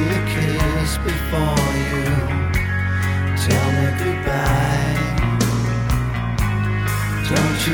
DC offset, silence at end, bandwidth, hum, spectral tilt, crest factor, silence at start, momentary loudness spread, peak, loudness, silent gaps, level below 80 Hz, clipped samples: under 0.1%; 0 s; 20 kHz; none; -5.5 dB/octave; 14 dB; 0 s; 3 LU; -4 dBFS; -20 LUFS; none; -28 dBFS; under 0.1%